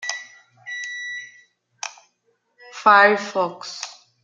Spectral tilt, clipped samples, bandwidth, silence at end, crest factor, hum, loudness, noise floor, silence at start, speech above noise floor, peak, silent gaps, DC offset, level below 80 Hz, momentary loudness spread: -2 dB/octave; under 0.1%; 9.2 kHz; 0.3 s; 22 dB; none; -19 LUFS; -69 dBFS; 0 s; 52 dB; -2 dBFS; none; under 0.1%; -82 dBFS; 22 LU